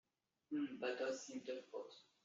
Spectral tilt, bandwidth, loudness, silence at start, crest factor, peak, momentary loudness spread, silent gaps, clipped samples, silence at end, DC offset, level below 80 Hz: -2.5 dB/octave; 7.6 kHz; -46 LUFS; 0.5 s; 18 dB; -30 dBFS; 10 LU; none; under 0.1%; 0.2 s; under 0.1%; under -90 dBFS